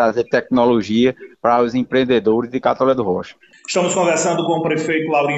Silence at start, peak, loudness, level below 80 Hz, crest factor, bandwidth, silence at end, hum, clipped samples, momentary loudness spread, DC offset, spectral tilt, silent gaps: 0 s; -2 dBFS; -17 LUFS; -54 dBFS; 14 dB; 9 kHz; 0 s; none; under 0.1%; 6 LU; under 0.1%; -4.5 dB/octave; none